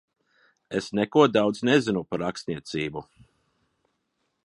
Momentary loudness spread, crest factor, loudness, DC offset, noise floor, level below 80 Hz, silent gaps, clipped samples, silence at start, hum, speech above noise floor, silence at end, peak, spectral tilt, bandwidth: 13 LU; 24 dB; -25 LUFS; under 0.1%; -76 dBFS; -62 dBFS; none; under 0.1%; 0.7 s; none; 52 dB; 1.45 s; -4 dBFS; -5.5 dB/octave; 11.5 kHz